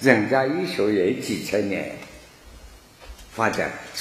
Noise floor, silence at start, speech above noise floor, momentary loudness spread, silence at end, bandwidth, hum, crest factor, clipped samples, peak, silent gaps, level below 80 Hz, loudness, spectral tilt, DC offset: -46 dBFS; 0 s; 24 dB; 19 LU; 0 s; 15 kHz; none; 24 dB; under 0.1%; 0 dBFS; none; -52 dBFS; -23 LUFS; -5 dB/octave; under 0.1%